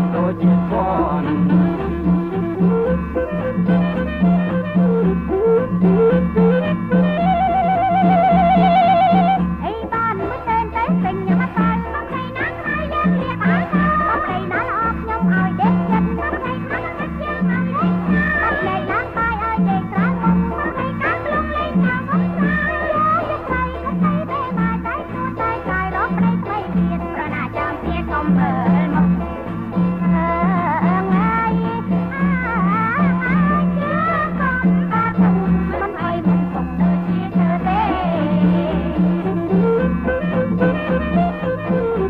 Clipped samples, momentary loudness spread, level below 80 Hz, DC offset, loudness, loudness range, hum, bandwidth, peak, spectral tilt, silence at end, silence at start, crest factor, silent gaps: under 0.1%; 7 LU; -34 dBFS; under 0.1%; -18 LUFS; 4 LU; none; 4.4 kHz; -4 dBFS; -10 dB/octave; 0 s; 0 s; 14 dB; none